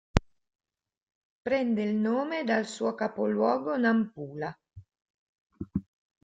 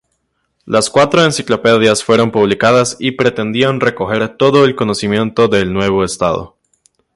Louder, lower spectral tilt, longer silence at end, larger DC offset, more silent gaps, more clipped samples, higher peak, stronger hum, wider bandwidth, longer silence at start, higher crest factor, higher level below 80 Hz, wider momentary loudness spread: second, -29 LUFS vs -13 LUFS; first, -6.5 dB/octave vs -4.5 dB/octave; second, 0.45 s vs 0.7 s; neither; first, 1.02-1.07 s, 1.15-1.43 s, 5.02-5.47 s vs none; neither; about the same, -2 dBFS vs 0 dBFS; neither; second, 9.2 kHz vs 11.5 kHz; second, 0.15 s vs 0.65 s; first, 28 dB vs 14 dB; about the same, -46 dBFS vs -44 dBFS; first, 11 LU vs 6 LU